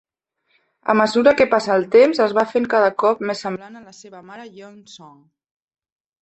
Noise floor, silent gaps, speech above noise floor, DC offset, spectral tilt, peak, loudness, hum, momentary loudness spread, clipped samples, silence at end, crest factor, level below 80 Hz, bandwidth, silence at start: -69 dBFS; none; 51 dB; under 0.1%; -5 dB/octave; -2 dBFS; -17 LUFS; none; 24 LU; under 0.1%; 1.25 s; 18 dB; -60 dBFS; 8.4 kHz; 0.85 s